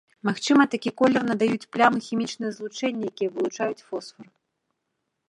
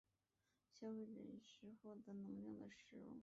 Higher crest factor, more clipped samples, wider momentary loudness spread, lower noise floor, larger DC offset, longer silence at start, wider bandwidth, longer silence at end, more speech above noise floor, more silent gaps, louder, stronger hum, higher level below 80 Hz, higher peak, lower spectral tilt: first, 22 dB vs 14 dB; neither; first, 12 LU vs 8 LU; second, -79 dBFS vs -89 dBFS; neither; second, 0.25 s vs 0.75 s; first, 11 kHz vs 7.6 kHz; first, 1.05 s vs 0 s; first, 55 dB vs 34 dB; neither; first, -24 LUFS vs -57 LUFS; neither; first, -74 dBFS vs -88 dBFS; first, -4 dBFS vs -42 dBFS; second, -5 dB/octave vs -6.5 dB/octave